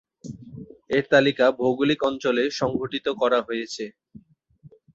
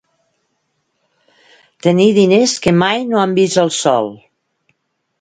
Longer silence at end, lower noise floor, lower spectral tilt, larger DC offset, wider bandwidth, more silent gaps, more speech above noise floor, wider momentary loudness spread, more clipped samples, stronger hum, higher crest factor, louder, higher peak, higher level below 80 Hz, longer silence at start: about the same, 1.05 s vs 1.05 s; second, -54 dBFS vs -68 dBFS; about the same, -5 dB/octave vs -5 dB/octave; neither; second, 8 kHz vs 10.5 kHz; neither; second, 31 dB vs 55 dB; first, 21 LU vs 6 LU; neither; neither; about the same, 20 dB vs 16 dB; second, -23 LUFS vs -13 LUFS; second, -4 dBFS vs 0 dBFS; second, -60 dBFS vs -54 dBFS; second, 0.25 s vs 1.85 s